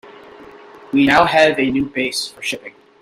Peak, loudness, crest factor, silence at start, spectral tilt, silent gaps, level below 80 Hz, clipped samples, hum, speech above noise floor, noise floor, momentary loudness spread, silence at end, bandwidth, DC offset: 0 dBFS; -16 LUFS; 18 dB; 0.05 s; -4 dB/octave; none; -50 dBFS; under 0.1%; none; 24 dB; -40 dBFS; 12 LU; 0.3 s; 15 kHz; under 0.1%